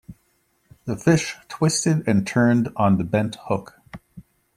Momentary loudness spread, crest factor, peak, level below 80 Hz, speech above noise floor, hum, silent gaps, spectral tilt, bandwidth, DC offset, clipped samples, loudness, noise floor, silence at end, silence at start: 16 LU; 18 dB; -4 dBFS; -54 dBFS; 46 dB; none; none; -5.5 dB/octave; 15 kHz; under 0.1%; under 0.1%; -21 LUFS; -66 dBFS; 0.35 s; 0.1 s